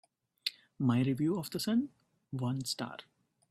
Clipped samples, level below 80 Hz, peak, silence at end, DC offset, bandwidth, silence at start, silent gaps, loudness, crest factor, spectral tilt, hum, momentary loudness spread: under 0.1%; -72 dBFS; -14 dBFS; 0.5 s; under 0.1%; 15.5 kHz; 0.45 s; none; -35 LUFS; 22 dB; -5.5 dB/octave; none; 13 LU